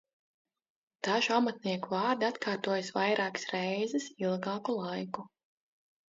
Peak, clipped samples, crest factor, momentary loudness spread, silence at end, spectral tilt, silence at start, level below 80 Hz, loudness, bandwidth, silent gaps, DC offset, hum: -14 dBFS; under 0.1%; 20 dB; 8 LU; 0.85 s; -3 dB/octave; 1.05 s; -82 dBFS; -32 LUFS; 7.6 kHz; none; under 0.1%; none